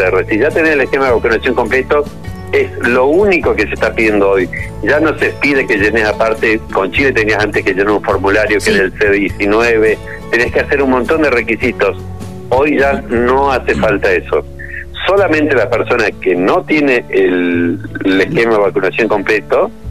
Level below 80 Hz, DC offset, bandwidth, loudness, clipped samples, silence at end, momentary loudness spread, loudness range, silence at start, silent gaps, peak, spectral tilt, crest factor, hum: -32 dBFS; 2%; 14 kHz; -12 LUFS; under 0.1%; 0 s; 5 LU; 1 LU; 0 s; none; 0 dBFS; -6 dB/octave; 12 dB; none